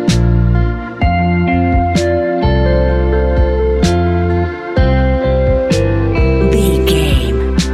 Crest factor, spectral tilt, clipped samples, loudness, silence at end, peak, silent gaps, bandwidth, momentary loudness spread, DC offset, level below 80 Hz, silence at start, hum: 12 dB; -6.5 dB/octave; under 0.1%; -13 LUFS; 0 s; 0 dBFS; none; 13.5 kHz; 3 LU; under 0.1%; -16 dBFS; 0 s; none